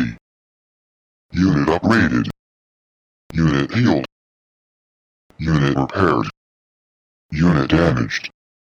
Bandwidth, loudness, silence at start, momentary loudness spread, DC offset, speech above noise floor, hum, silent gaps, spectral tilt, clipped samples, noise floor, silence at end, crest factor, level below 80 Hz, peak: 8.6 kHz; -18 LUFS; 0 s; 12 LU; under 0.1%; over 74 dB; none; 0.21-1.29 s, 2.39-3.30 s, 4.12-5.30 s, 6.37-7.29 s; -7 dB/octave; under 0.1%; under -90 dBFS; 0.35 s; 18 dB; -38 dBFS; -2 dBFS